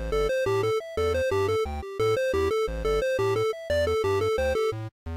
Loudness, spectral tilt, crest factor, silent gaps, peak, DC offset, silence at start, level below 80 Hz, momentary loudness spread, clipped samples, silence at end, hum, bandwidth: -26 LUFS; -5.5 dB/octave; 6 dB; 4.92-5.06 s; -18 dBFS; under 0.1%; 0 s; -40 dBFS; 3 LU; under 0.1%; 0 s; none; 16 kHz